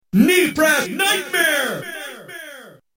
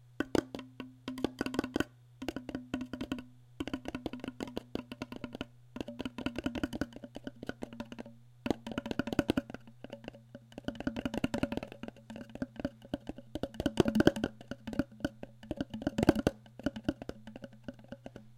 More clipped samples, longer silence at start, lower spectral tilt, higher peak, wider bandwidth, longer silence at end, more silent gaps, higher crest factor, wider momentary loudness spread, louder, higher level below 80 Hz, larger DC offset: neither; about the same, 0.15 s vs 0.2 s; second, -3.5 dB/octave vs -6 dB/octave; first, -2 dBFS vs -6 dBFS; about the same, 16.5 kHz vs 16.5 kHz; first, 0.3 s vs 0 s; neither; second, 18 dB vs 32 dB; about the same, 20 LU vs 18 LU; first, -17 LUFS vs -37 LUFS; about the same, -58 dBFS vs -54 dBFS; neither